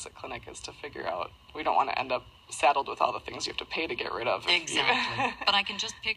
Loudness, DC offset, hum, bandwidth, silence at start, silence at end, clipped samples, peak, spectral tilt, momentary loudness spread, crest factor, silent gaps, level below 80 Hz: -28 LUFS; under 0.1%; none; 14.5 kHz; 0 s; 0 s; under 0.1%; -8 dBFS; -2 dB/octave; 15 LU; 22 dB; none; -60 dBFS